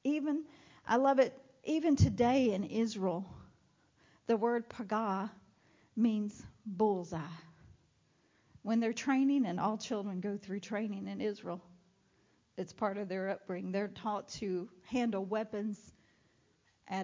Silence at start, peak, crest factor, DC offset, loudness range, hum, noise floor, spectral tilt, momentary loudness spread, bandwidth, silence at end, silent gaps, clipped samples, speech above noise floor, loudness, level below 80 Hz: 0.05 s; -16 dBFS; 20 dB; under 0.1%; 8 LU; none; -72 dBFS; -6.5 dB/octave; 16 LU; 7.6 kHz; 0 s; none; under 0.1%; 38 dB; -35 LUFS; -58 dBFS